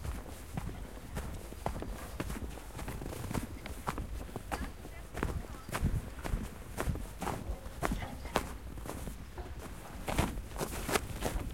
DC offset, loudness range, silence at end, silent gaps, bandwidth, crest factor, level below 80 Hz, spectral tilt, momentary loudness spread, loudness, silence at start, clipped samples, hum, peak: 0.2%; 3 LU; 0 s; none; 16.5 kHz; 28 dB; -44 dBFS; -5 dB/octave; 10 LU; -40 LUFS; 0 s; under 0.1%; none; -10 dBFS